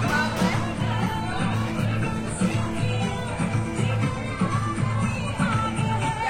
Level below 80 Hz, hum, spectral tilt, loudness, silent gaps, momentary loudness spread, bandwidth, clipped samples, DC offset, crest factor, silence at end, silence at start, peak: -42 dBFS; none; -6 dB/octave; -25 LUFS; none; 3 LU; 15.5 kHz; under 0.1%; under 0.1%; 16 dB; 0 s; 0 s; -10 dBFS